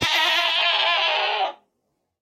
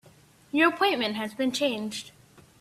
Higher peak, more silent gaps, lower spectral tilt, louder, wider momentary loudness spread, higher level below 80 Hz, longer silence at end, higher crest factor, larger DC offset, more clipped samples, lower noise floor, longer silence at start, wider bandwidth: first, -6 dBFS vs -10 dBFS; neither; second, -1 dB/octave vs -3.5 dB/octave; first, -19 LUFS vs -26 LUFS; second, 7 LU vs 14 LU; first, -60 dBFS vs -70 dBFS; first, 0.65 s vs 0.5 s; about the same, 16 dB vs 20 dB; neither; neither; first, -75 dBFS vs -56 dBFS; second, 0 s vs 0.55 s; first, 18 kHz vs 15 kHz